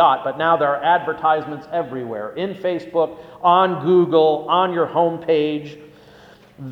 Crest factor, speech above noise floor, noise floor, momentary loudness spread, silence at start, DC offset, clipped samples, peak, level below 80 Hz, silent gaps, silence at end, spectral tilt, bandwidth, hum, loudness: 18 dB; 28 dB; -46 dBFS; 11 LU; 0 s; under 0.1%; under 0.1%; -2 dBFS; -62 dBFS; none; 0 s; -7.5 dB/octave; 6.2 kHz; none; -19 LUFS